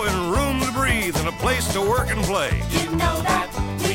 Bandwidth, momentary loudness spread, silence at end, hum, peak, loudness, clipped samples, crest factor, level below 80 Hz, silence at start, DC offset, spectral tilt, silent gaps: 16.5 kHz; 3 LU; 0 s; none; -6 dBFS; -22 LUFS; under 0.1%; 16 dB; -30 dBFS; 0 s; under 0.1%; -4.5 dB/octave; none